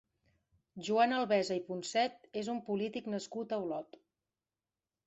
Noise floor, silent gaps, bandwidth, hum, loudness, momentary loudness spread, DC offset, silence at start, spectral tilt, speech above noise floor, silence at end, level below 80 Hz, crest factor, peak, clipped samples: under -90 dBFS; none; 8.2 kHz; none; -35 LUFS; 12 LU; under 0.1%; 0.75 s; -4.5 dB/octave; over 55 dB; 1.25 s; -80 dBFS; 18 dB; -18 dBFS; under 0.1%